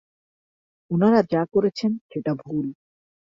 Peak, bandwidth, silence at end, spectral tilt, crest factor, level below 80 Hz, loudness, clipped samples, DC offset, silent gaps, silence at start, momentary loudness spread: -4 dBFS; 7.4 kHz; 0.55 s; -8 dB/octave; 20 dB; -64 dBFS; -23 LUFS; under 0.1%; under 0.1%; 2.01-2.09 s; 0.9 s; 11 LU